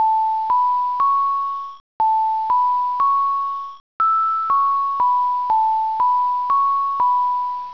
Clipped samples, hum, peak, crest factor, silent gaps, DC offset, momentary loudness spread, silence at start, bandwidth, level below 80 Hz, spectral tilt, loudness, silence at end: under 0.1%; none; -10 dBFS; 8 dB; 1.80-2.00 s, 3.80-4.00 s; 0.5%; 6 LU; 0 s; 5.4 kHz; -66 dBFS; -3.5 dB/octave; -18 LUFS; 0 s